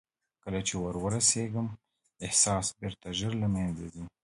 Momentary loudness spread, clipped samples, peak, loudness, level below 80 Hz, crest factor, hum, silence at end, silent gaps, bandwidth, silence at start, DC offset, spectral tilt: 15 LU; under 0.1%; -10 dBFS; -29 LUFS; -52 dBFS; 22 dB; none; 0.15 s; none; 11.5 kHz; 0.45 s; under 0.1%; -3.5 dB/octave